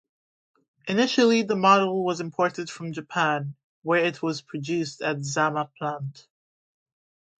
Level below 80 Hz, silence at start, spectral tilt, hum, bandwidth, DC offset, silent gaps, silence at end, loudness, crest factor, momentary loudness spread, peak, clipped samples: -74 dBFS; 0.85 s; -5 dB/octave; none; 9.2 kHz; under 0.1%; 3.64-3.82 s; 1.25 s; -24 LUFS; 20 dB; 15 LU; -6 dBFS; under 0.1%